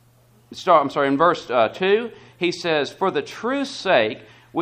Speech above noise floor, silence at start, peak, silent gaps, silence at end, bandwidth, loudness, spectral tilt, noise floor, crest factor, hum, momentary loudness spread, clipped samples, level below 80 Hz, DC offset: 35 dB; 0.5 s; -2 dBFS; none; 0 s; 14.5 kHz; -21 LUFS; -5 dB/octave; -55 dBFS; 18 dB; none; 11 LU; under 0.1%; -62 dBFS; under 0.1%